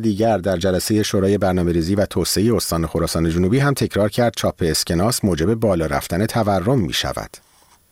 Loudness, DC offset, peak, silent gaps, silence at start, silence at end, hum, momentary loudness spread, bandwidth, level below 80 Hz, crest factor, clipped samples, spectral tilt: -19 LUFS; 0.2%; -8 dBFS; none; 0 s; 0.55 s; none; 3 LU; 17 kHz; -38 dBFS; 12 dB; under 0.1%; -5 dB/octave